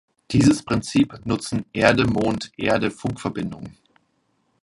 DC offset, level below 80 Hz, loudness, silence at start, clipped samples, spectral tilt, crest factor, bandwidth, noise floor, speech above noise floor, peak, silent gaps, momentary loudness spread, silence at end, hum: under 0.1%; -46 dBFS; -22 LUFS; 0.3 s; under 0.1%; -5.5 dB/octave; 22 dB; 11.5 kHz; -68 dBFS; 47 dB; 0 dBFS; none; 11 LU; 0.95 s; none